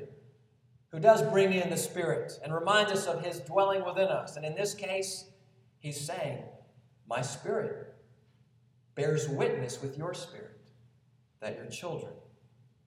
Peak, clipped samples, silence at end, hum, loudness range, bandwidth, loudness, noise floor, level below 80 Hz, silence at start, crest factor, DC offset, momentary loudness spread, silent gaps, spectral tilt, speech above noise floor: -10 dBFS; under 0.1%; 0.65 s; none; 10 LU; 15.5 kHz; -31 LUFS; -66 dBFS; -78 dBFS; 0 s; 24 dB; under 0.1%; 19 LU; none; -4.5 dB/octave; 36 dB